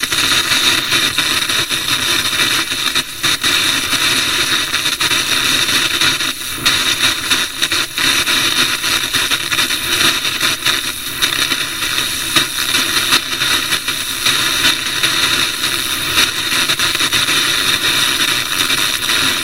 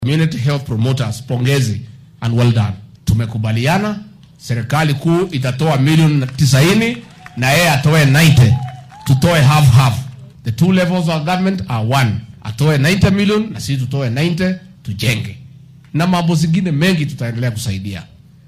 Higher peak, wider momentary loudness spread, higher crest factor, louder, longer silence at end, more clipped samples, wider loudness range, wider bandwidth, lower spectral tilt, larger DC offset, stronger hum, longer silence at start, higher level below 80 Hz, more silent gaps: about the same, 0 dBFS vs 0 dBFS; second, 3 LU vs 14 LU; about the same, 16 dB vs 14 dB; about the same, -13 LUFS vs -15 LUFS; second, 0 s vs 0.45 s; neither; second, 1 LU vs 6 LU; about the same, 16.5 kHz vs 16 kHz; second, 0 dB/octave vs -6 dB/octave; first, 1% vs under 0.1%; neither; about the same, 0 s vs 0 s; second, -44 dBFS vs -38 dBFS; neither